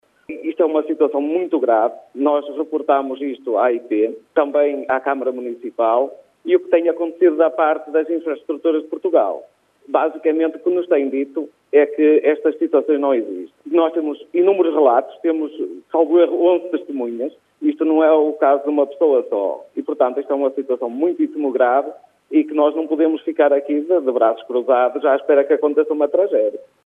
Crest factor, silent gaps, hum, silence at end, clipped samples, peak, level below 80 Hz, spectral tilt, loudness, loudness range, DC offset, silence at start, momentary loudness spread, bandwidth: 16 dB; none; none; 0.25 s; under 0.1%; -2 dBFS; -80 dBFS; -6.5 dB/octave; -18 LUFS; 3 LU; under 0.1%; 0.3 s; 9 LU; 3.8 kHz